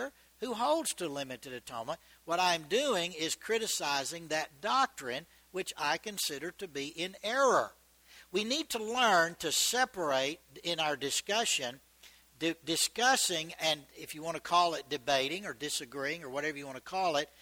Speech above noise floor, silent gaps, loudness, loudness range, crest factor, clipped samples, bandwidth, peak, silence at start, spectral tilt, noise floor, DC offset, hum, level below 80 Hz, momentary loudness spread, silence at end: 27 dB; none; -32 LUFS; 4 LU; 20 dB; under 0.1%; over 20 kHz; -14 dBFS; 0 s; -1.5 dB/octave; -60 dBFS; under 0.1%; none; -72 dBFS; 13 LU; 0.15 s